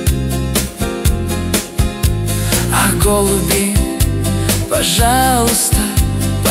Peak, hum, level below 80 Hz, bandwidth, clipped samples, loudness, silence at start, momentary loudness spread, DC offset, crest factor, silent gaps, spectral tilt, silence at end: 0 dBFS; none; -20 dBFS; 16.5 kHz; under 0.1%; -14 LUFS; 0 s; 6 LU; under 0.1%; 14 dB; none; -4 dB/octave; 0 s